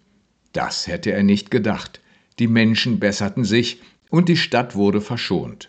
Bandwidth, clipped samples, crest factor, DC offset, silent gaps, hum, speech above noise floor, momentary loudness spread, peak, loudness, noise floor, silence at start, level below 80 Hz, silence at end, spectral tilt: 8.8 kHz; under 0.1%; 18 dB; under 0.1%; none; none; 43 dB; 10 LU; -2 dBFS; -19 LUFS; -62 dBFS; 0.55 s; -54 dBFS; 0.05 s; -5.5 dB/octave